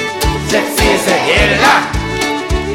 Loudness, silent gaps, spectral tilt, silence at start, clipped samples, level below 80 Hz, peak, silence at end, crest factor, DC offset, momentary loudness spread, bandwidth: -12 LUFS; none; -3.5 dB/octave; 0 s; under 0.1%; -22 dBFS; 0 dBFS; 0 s; 12 dB; under 0.1%; 7 LU; 19 kHz